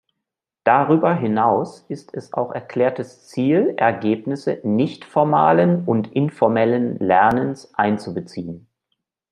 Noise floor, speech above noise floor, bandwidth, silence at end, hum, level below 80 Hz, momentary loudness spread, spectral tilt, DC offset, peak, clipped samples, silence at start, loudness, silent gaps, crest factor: -83 dBFS; 64 dB; 10.5 kHz; 0.75 s; none; -62 dBFS; 15 LU; -8 dB/octave; under 0.1%; -2 dBFS; under 0.1%; 0.65 s; -19 LUFS; none; 18 dB